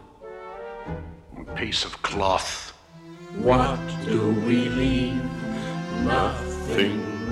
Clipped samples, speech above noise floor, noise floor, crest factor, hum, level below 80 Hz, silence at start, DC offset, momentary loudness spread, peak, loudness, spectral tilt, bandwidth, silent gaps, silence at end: under 0.1%; 21 dB; -45 dBFS; 20 dB; none; -40 dBFS; 0 s; under 0.1%; 17 LU; -6 dBFS; -25 LUFS; -5.5 dB/octave; 12.5 kHz; none; 0 s